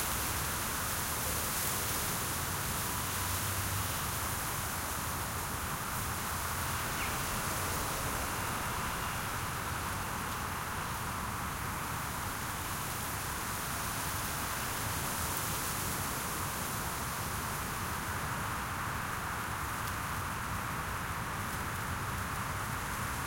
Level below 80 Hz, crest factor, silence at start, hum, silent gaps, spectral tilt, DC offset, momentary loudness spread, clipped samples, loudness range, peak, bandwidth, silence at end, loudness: -48 dBFS; 16 dB; 0 s; none; none; -3 dB/octave; under 0.1%; 4 LU; under 0.1%; 3 LU; -20 dBFS; 16.5 kHz; 0 s; -35 LUFS